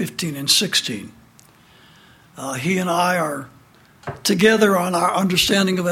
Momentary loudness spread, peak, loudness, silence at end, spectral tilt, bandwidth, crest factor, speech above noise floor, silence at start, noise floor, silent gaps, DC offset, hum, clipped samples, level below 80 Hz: 16 LU; -2 dBFS; -18 LUFS; 0 s; -3.5 dB/octave; 16.5 kHz; 18 dB; 31 dB; 0 s; -51 dBFS; none; under 0.1%; none; under 0.1%; -54 dBFS